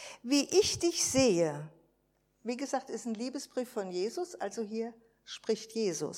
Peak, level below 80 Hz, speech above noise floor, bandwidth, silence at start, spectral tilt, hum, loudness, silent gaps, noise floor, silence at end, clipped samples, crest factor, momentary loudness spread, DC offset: -14 dBFS; -64 dBFS; 42 dB; 16.5 kHz; 0 s; -3.5 dB/octave; none; -32 LUFS; none; -74 dBFS; 0 s; under 0.1%; 20 dB; 14 LU; under 0.1%